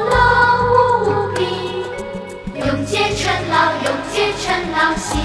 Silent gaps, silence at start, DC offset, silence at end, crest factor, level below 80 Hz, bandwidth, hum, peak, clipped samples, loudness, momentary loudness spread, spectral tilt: none; 0 s; under 0.1%; 0 s; 16 dB; -34 dBFS; 11 kHz; none; 0 dBFS; under 0.1%; -16 LUFS; 12 LU; -4 dB/octave